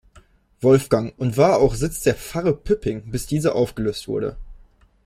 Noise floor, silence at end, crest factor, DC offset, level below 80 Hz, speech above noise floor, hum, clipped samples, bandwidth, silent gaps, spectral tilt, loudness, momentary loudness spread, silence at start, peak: -53 dBFS; 0.5 s; 18 dB; under 0.1%; -40 dBFS; 33 dB; none; under 0.1%; 16 kHz; none; -6 dB/octave; -21 LUFS; 10 LU; 0.15 s; -2 dBFS